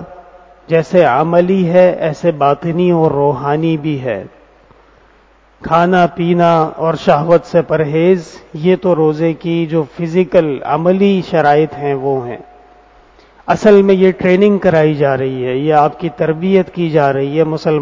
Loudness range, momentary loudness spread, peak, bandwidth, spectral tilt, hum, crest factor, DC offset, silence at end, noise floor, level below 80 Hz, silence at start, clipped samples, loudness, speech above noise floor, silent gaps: 4 LU; 7 LU; 0 dBFS; 7.6 kHz; -8 dB/octave; none; 12 dB; under 0.1%; 0 s; -48 dBFS; -48 dBFS; 0 s; 0.2%; -13 LUFS; 36 dB; none